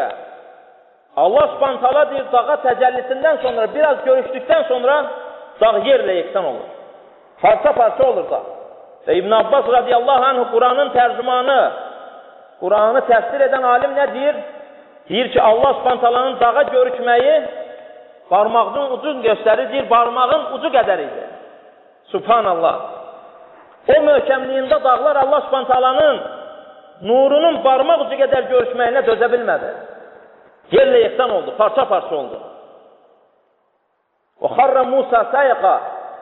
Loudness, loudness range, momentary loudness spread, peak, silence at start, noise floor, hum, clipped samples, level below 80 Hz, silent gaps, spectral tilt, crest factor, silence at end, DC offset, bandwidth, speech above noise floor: -15 LUFS; 3 LU; 14 LU; -2 dBFS; 0 s; -66 dBFS; none; under 0.1%; -56 dBFS; none; -1.5 dB/octave; 16 dB; 0 s; under 0.1%; 4.2 kHz; 51 dB